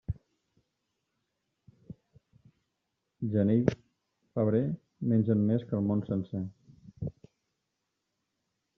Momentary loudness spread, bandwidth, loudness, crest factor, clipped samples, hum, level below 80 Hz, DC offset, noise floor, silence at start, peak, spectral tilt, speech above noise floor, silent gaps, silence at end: 16 LU; 6.4 kHz; -30 LUFS; 24 dB; under 0.1%; none; -60 dBFS; under 0.1%; -83 dBFS; 0.1 s; -8 dBFS; -10.5 dB/octave; 55 dB; none; 1.65 s